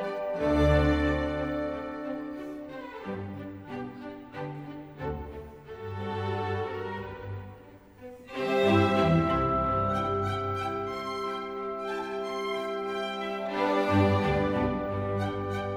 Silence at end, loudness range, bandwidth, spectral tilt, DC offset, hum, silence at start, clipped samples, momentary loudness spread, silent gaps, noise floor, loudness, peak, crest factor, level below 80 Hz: 0 s; 12 LU; over 20 kHz; -7.5 dB/octave; under 0.1%; none; 0 s; under 0.1%; 16 LU; none; -51 dBFS; -29 LUFS; -12 dBFS; 18 dB; -42 dBFS